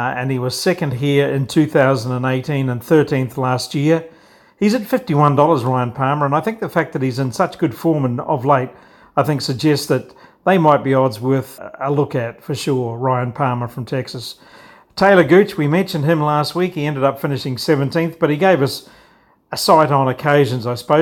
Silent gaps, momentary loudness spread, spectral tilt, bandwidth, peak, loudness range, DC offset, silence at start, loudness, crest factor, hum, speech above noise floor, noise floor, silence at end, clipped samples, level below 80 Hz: none; 9 LU; -6.5 dB/octave; 18 kHz; 0 dBFS; 3 LU; under 0.1%; 0 s; -17 LUFS; 16 dB; none; 36 dB; -53 dBFS; 0 s; under 0.1%; -56 dBFS